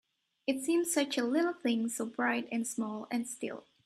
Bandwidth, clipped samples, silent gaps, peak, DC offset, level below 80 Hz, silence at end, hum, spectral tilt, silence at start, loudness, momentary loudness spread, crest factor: 15.5 kHz; under 0.1%; none; -16 dBFS; under 0.1%; -82 dBFS; 0.25 s; none; -3 dB/octave; 0.45 s; -33 LUFS; 8 LU; 18 dB